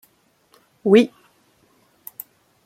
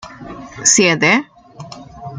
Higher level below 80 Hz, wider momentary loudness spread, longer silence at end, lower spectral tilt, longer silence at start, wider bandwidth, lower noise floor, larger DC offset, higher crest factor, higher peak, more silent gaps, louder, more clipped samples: second, -66 dBFS vs -52 dBFS; about the same, 26 LU vs 24 LU; first, 1.6 s vs 0 s; first, -6.5 dB/octave vs -2.5 dB/octave; first, 0.85 s vs 0.05 s; first, 16.5 kHz vs 10.5 kHz; first, -61 dBFS vs -35 dBFS; neither; about the same, 22 dB vs 18 dB; about the same, -2 dBFS vs 0 dBFS; neither; second, -18 LUFS vs -12 LUFS; neither